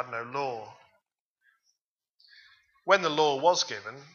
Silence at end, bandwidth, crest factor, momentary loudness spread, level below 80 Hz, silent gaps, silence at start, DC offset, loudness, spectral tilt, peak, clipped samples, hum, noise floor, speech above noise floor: 0.1 s; 7.4 kHz; 24 dB; 17 LU; -82 dBFS; 1.20-1.36 s, 1.81-1.96 s, 2.10-2.18 s; 0 s; under 0.1%; -27 LUFS; -2.5 dB/octave; -6 dBFS; under 0.1%; none; -83 dBFS; 55 dB